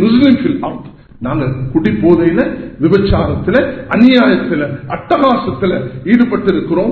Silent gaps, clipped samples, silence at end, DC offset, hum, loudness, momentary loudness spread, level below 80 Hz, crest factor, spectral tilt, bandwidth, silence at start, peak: none; 0.3%; 0 s; under 0.1%; none; -12 LUFS; 10 LU; -32 dBFS; 12 dB; -9 dB/octave; 4.6 kHz; 0 s; 0 dBFS